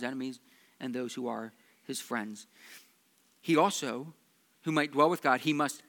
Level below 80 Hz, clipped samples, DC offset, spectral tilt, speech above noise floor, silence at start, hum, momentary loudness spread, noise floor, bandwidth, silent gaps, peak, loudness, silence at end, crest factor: under -90 dBFS; under 0.1%; under 0.1%; -4.5 dB/octave; 37 dB; 0 s; none; 23 LU; -68 dBFS; 19 kHz; none; -10 dBFS; -31 LUFS; 0.1 s; 22 dB